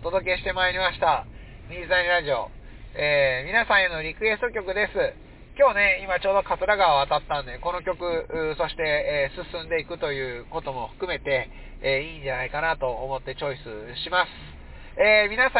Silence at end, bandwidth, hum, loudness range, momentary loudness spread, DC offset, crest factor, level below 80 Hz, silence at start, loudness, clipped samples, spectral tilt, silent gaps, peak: 0 s; 4 kHz; none; 5 LU; 13 LU; under 0.1%; 16 dB; -44 dBFS; 0 s; -24 LUFS; under 0.1%; -7.5 dB/octave; none; -8 dBFS